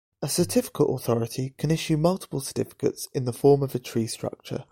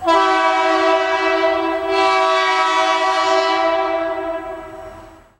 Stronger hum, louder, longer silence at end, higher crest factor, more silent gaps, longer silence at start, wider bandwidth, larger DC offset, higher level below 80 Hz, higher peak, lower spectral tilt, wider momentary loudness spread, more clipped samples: neither; second, -26 LUFS vs -16 LUFS; second, 0.1 s vs 0.3 s; about the same, 18 dB vs 16 dB; neither; first, 0.2 s vs 0 s; first, 17 kHz vs 11.5 kHz; neither; about the same, -56 dBFS vs -52 dBFS; second, -8 dBFS vs 0 dBFS; first, -5.5 dB/octave vs -2.5 dB/octave; second, 10 LU vs 13 LU; neither